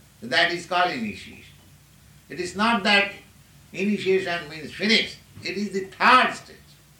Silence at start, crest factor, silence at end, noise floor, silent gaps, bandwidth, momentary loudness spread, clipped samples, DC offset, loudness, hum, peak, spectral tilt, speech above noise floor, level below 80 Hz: 0.2 s; 20 dB; 0.45 s; -52 dBFS; none; 17.5 kHz; 18 LU; under 0.1%; under 0.1%; -22 LUFS; none; -4 dBFS; -3.5 dB/octave; 29 dB; -60 dBFS